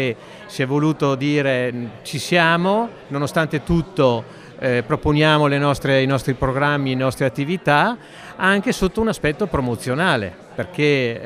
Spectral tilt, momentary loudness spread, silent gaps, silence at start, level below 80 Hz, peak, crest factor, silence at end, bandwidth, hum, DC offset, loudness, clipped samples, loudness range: -6 dB/octave; 10 LU; none; 0 s; -40 dBFS; -2 dBFS; 18 dB; 0 s; 15.5 kHz; none; under 0.1%; -19 LUFS; under 0.1%; 2 LU